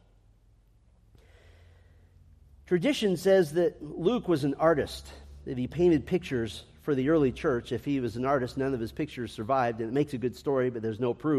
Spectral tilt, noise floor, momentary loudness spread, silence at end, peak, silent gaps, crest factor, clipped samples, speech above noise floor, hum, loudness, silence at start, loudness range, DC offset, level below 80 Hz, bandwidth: -6.5 dB/octave; -61 dBFS; 10 LU; 0 s; -10 dBFS; none; 20 dB; under 0.1%; 34 dB; none; -28 LUFS; 2.7 s; 3 LU; under 0.1%; -54 dBFS; 15 kHz